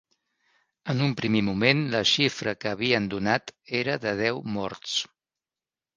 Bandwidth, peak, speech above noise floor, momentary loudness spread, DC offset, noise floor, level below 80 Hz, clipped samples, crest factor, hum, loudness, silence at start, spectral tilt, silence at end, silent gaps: 10 kHz; -4 dBFS; over 64 dB; 9 LU; under 0.1%; under -90 dBFS; -60 dBFS; under 0.1%; 22 dB; none; -25 LUFS; 0.85 s; -4.5 dB/octave; 0.9 s; none